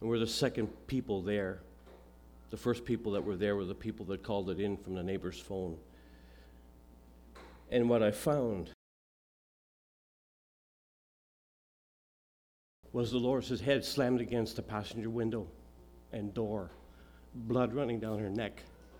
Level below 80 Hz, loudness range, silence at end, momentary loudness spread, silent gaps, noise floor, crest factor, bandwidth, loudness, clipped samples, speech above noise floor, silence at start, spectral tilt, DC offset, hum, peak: -58 dBFS; 6 LU; 0 s; 15 LU; 8.74-12.83 s; -58 dBFS; 20 dB; 19.5 kHz; -35 LUFS; under 0.1%; 23 dB; 0 s; -6 dB/octave; under 0.1%; none; -16 dBFS